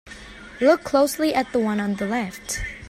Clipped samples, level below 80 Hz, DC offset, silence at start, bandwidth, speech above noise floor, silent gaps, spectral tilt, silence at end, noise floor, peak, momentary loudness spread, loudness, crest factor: under 0.1%; -44 dBFS; under 0.1%; 0.05 s; 16 kHz; 19 dB; none; -4.5 dB/octave; 0 s; -41 dBFS; -6 dBFS; 16 LU; -22 LUFS; 18 dB